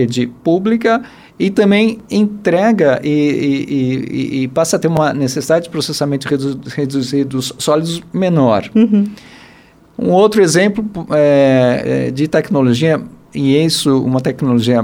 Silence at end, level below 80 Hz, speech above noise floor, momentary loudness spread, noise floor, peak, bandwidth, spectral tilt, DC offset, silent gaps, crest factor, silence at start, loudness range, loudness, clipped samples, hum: 0 s; -50 dBFS; 31 dB; 8 LU; -44 dBFS; 0 dBFS; 17 kHz; -6 dB/octave; under 0.1%; none; 12 dB; 0 s; 3 LU; -14 LUFS; under 0.1%; none